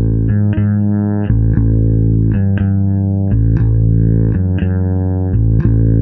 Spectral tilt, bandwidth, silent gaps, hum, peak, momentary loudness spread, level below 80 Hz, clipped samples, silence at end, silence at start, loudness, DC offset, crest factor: -13.5 dB/octave; 3 kHz; none; none; 0 dBFS; 3 LU; -20 dBFS; under 0.1%; 0 s; 0 s; -14 LUFS; under 0.1%; 12 dB